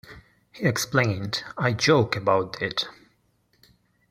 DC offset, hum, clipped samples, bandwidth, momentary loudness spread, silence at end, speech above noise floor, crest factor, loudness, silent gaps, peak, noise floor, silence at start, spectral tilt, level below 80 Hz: under 0.1%; none; under 0.1%; 15.5 kHz; 9 LU; 1.2 s; 43 dB; 22 dB; -24 LUFS; none; -4 dBFS; -66 dBFS; 0.05 s; -4.5 dB/octave; -60 dBFS